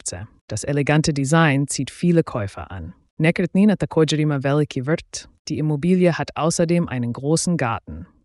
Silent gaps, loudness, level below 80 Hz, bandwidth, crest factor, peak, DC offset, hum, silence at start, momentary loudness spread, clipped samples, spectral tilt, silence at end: 0.41-0.48 s, 3.11-3.17 s, 5.39-5.45 s; -20 LUFS; -48 dBFS; 12 kHz; 16 dB; -4 dBFS; under 0.1%; none; 0.05 s; 14 LU; under 0.1%; -5.5 dB/octave; 0.2 s